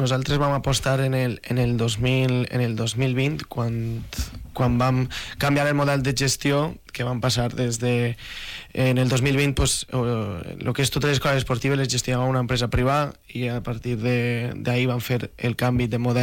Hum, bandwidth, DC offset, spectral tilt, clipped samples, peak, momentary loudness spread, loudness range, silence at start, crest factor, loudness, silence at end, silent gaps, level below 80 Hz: none; 17 kHz; under 0.1%; -5 dB/octave; under 0.1%; -14 dBFS; 8 LU; 2 LU; 0 s; 8 dB; -23 LUFS; 0 s; none; -40 dBFS